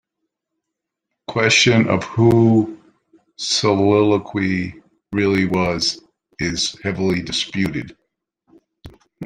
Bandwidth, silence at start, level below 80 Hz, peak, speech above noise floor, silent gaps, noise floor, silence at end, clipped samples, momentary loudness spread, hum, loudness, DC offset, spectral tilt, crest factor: 11 kHz; 1.3 s; -50 dBFS; -2 dBFS; 64 dB; none; -81 dBFS; 0 s; under 0.1%; 14 LU; none; -18 LUFS; under 0.1%; -4.5 dB/octave; 18 dB